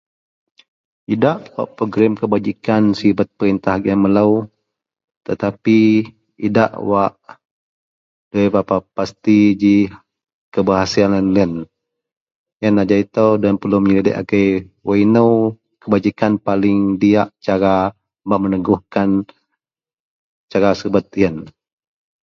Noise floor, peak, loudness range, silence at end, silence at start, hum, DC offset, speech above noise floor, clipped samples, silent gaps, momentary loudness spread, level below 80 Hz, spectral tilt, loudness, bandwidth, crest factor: -89 dBFS; 0 dBFS; 4 LU; 0.75 s; 1.1 s; none; under 0.1%; 74 dB; under 0.1%; 5.04-5.08 s, 5.17-5.21 s, 7.45-8.31 s, 10.33-10.52 s, 12.17-12.26 s, 12.35-12.46 s, 12.53-12.60 s, 19.94-20.48 s; 10 LU; -48 dBFS; -7.5 dB/octave; -16 LUFS; 7 kHz; 16 dB